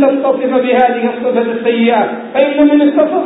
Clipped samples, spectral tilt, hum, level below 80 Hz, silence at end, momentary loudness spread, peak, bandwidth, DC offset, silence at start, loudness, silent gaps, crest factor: under 0.1%; -9 dB/octave; none; -58 dBFS; 0 s; 5 LU; 0 dBFS; 4 kHz; under 0.1%; 0 s; -12 LUFS; none; 12 dB